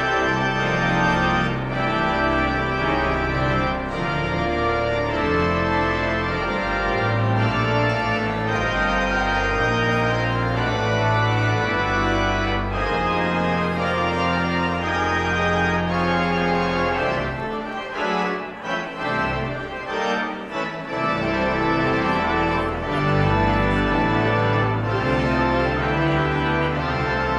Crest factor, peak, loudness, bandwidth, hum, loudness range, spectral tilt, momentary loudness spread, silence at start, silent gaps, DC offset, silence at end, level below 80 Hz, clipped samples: 14 dB; -6 dBFS; -21 LUFS; 9.8 kHz; none; 3 LU; -6.5 dB/octave; 5 LU; 0 s; none; under 0.1%; 0 s; -36 dBFS; under 0.1%